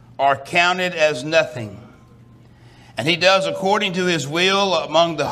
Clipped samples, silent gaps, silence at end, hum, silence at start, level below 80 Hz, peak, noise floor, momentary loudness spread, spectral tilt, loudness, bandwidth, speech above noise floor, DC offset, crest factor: under 0.1%; none; 0 s; none; 0.2 s; -60 dBFS; -2 dBFS; -47 dBFS; 9 LU; -3.5 dB/octave; -18 LUFS; 15 kHz; 28 dB; under 0.1%; 18 dB